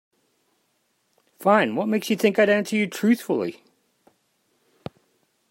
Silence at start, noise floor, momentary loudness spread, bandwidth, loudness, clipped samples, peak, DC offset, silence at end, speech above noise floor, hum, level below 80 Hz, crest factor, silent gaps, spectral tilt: 1.4 s; -70 dBFS; 23 LU; 16.5 kHz; -22 LUFS; under 0.1%; -4 dBFS; under 0.1%; 2 s; 49 dB; none; -74 dBFS; 20 dB; none; -5.5 dB/octave